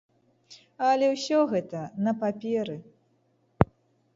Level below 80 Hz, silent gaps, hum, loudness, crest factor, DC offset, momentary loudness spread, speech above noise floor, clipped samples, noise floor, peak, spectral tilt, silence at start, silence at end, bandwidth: -50 dBFS; none; none; -27 LUFS; 28 dB; under 0.1%; 9 LU; 42 dB; under 0.1%; -68 dBFS; 0 dBFS; -6.5 dB/octave; 0.5 s; 0.5 s; 7.8 kHz